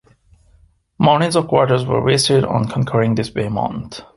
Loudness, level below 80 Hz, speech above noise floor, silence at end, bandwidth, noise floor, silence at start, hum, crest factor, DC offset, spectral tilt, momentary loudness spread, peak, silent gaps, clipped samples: -17 LUFS; -46 dBFS; 37 dB; 0.15 s; 11.5 kHz; -53 dBFS; 1 s; none; 16 dB; under 0.1%; -5.5 dB/octave; 7 LU; 0 dBFS; none; under 0.1%